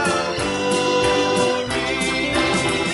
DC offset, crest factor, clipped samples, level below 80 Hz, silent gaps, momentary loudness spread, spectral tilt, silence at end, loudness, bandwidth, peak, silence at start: under 0.1%; 14 dB; under 0.1%; -42 dBFS; none; 4 LU; -3.5 dB/octave; 0 s; -19 LUFS; 11.5 kHz; -6 dBFS; 0 s